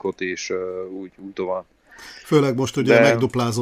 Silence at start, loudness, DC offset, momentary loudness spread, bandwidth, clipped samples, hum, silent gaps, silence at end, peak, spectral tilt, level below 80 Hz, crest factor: 0.05 s; -20 LUFS; under 0.1%; 20 LU; 15.5 kHz; under 0.1%; none; none; 0 s; -2 dBFS; -5.5 dB/octave; -58 dBFS; 20 dB